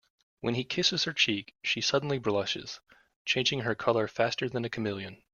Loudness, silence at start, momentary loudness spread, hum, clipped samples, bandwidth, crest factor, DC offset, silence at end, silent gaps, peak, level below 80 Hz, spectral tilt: -29 LUFS; 0.45 s; 10 LU; none; under 0.1%; 7.4 kHz; 20 dB; under 0.1%; 0.2 s; 3.16-3.25 s; -10 dBFS; -66 dBFS; -3.5 dB/octave